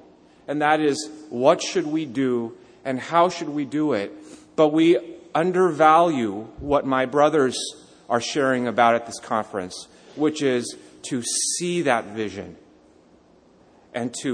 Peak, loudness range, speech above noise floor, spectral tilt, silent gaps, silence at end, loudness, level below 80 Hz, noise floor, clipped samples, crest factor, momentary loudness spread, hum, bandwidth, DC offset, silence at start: -2 dBFS; 5 LU; 33 dB; -4 dB/octave; none; 0 s; -22 LUFS; -58 dBFS; -55 dBFS; under 0.1%; 20 dB; 15 LU; none; 10.5 kHz; under 0.1%; 0.5 s